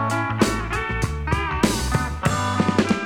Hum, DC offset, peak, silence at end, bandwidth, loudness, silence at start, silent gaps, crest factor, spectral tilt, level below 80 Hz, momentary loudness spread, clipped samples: none; 0.2%; -2 dBFS; 0 s; 19.5 kHz; -22 LUFS; 0 s; none; 18 dB; -5 dB/octave; -32 dBFS; 4 LU; under 0.1%